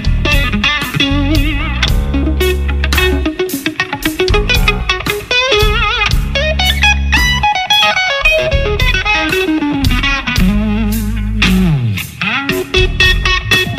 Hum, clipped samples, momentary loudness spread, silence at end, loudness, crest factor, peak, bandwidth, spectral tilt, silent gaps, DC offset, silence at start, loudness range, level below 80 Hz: none; under 0.1%; 6 LU; 0 s; -12 LUFS; 12 dB; 0 dBFS; 16 kHz; -4.5 dB/octave; none; under 0.1%; 0 s; 3 LU; -18 dBFS